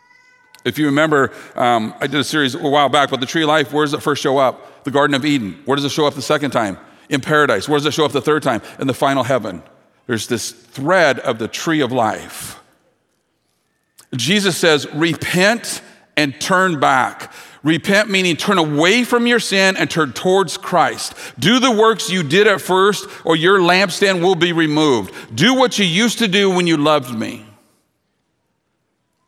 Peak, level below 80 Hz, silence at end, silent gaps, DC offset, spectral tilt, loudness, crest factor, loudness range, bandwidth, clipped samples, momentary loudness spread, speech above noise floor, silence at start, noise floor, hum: 0 dBFS; -62 dBFS; 1.85 s; none; under 0.1%; -4 dB/octave; -16 LUFS; 16 dB; 5 LU; 16.5 kHz; under 0.1%; 10 LU; 52 dB; 0.65 s; -68 dBFS; none